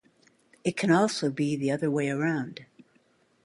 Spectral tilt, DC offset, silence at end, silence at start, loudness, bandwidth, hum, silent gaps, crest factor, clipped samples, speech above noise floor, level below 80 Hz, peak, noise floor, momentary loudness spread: -5.5 dB/octave; under 0.1%; 0.8 s; 0.65 s; -27 LUFS; 11.5 kHz; none; none; 20 dB; under 0.1%; 39 dB; -70 dBFS; -10 dBFS; -66 dBFS; 10 LU